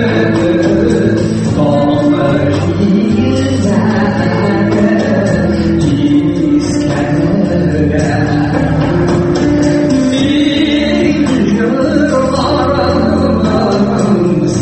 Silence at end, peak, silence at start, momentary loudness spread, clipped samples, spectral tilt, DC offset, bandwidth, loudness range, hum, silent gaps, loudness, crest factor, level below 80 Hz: 0 s; 0 dBFS; 0 s; 2 LU; under 0.1%; -7 dB/octave; under 0.1%; 8.8 kHz; 1 LU; none; none; -11 LUFS; 10 dB; -30 dBFS